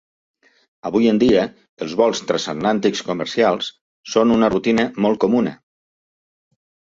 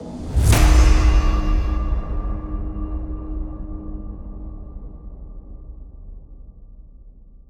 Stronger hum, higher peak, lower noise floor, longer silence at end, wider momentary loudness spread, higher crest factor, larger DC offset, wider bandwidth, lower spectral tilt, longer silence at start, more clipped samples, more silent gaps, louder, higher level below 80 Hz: neither; about the same, -2 dBFS vs -2 dBFS; first, under -90 dBFS vs -43 dBFS; first, 1.35 s vs 0.15 s; second, 10 LU vs 26 LU; about the same, 18 dB vs 18 dB; neither; second, 7.8 kHz vs 18 kHz; about the same, -5 dB/octave vs -5.5 dB/octave; first, 0.85 s vs 0 s; neither; first, 1.69-1.77 s, 3.81-4.04 s vs none; first, -18 LUFS vs -21 LUFS; second, -54 dBFS vs -22 dBFS